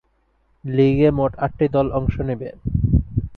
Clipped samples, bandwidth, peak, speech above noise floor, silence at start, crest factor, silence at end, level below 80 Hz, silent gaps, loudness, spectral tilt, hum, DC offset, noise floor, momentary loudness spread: under 0.1%; 4.6 kHz; -4 dBFS; 44 dB; 0.65 s; 16 dB; 0 s; -30 dBFS; none; -20 LUFS; -11 dB/octave; none; under 0.1%; -63 dBFS; 10 LU